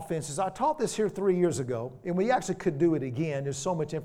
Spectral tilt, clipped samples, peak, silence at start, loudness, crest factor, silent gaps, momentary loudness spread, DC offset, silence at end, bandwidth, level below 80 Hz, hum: -6 dB/octave; under 0.1%; -14 dBFS; 0 s; -29 LUFS; 16 dB; none; 6 LU; under 0.1%; 0 s; 14.5 kHz; -60 dBFS; none